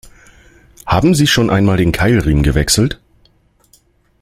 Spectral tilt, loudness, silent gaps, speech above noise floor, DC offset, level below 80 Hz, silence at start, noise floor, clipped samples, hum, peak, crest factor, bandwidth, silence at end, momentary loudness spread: -5 dB/octave; -13 LUFS; none; 42 dB; under 0.1%; -28 dBFS; 0.85 s; -53 dBFS; under 0.1%; none; 0 dBFS; 14 dB; 16 kHz; 1.25 s; 7 LU